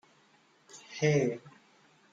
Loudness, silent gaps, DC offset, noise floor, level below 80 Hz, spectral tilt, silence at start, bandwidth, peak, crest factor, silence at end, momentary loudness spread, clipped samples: -30 LUFS; none; under 0.1%; -65 dBFS; -74 dBFS; -6 dB/octave; 0.75 s; 7.8 kHz; -14 dBFS; 20 dB; 0.65 s; 24 LU; under 0.1%